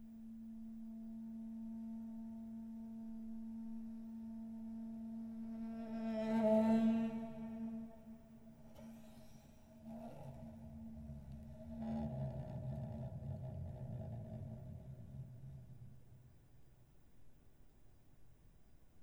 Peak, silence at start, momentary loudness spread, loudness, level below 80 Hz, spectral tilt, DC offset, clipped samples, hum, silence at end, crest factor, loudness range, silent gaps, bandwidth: -24 dBFS; 0 s; 19 LU; -45 LUFS; -64 dBFS; -9 dB/octave; under 0.1%; under 0.1%; none; 0 s; 20 dB; 17 LU; none; 9.6 kHz